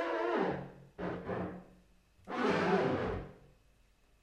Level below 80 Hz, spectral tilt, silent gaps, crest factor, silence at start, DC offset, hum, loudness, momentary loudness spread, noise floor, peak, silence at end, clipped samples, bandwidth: -58 dBFS; -7 dB/octave; none; 18 dB; 0 s; under 0.1%; none; -35 LUFS; 15 LU; -67 dBFS; -18 dBFS; 0.85 s; under 0.1%; 10.5 kHz